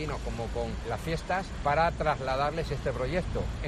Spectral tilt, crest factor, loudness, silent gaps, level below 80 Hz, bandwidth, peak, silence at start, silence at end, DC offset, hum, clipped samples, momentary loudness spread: -6 dB/octave; 16 dB; -31 LUFS; none; -38 dBFS; 13.5 kHz; -14 dBFS; 0 s; 0 s; under 0.1%; none; under 0.1%; 8 LU